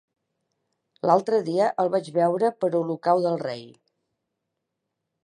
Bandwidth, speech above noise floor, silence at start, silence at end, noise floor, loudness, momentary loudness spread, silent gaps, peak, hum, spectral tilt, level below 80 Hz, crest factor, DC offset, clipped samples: 10.5 kHz; 59 dB; 1.05 s; 1.5 s; -81 dBFS; -24 LUFS; 8 LU; none; -6 dBFS; none; -7 dB/octave; -78 dBFS; 20 dB; under 0.1%; under 0.1%